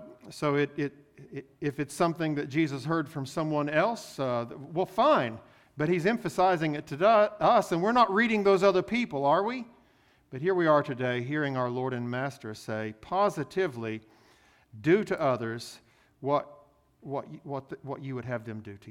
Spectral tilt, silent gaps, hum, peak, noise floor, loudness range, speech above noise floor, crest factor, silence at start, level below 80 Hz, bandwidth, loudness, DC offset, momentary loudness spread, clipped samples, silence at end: -6.5 dB/octave; none; none; -10 dBFS; -64 dBFS; 7 LU; 36 dB; 18 dB; 0 s; -66 dBFS; 15.5 kHz; -28 LUFS; under 0.1%; 15 LU; under 0.1%; 0 s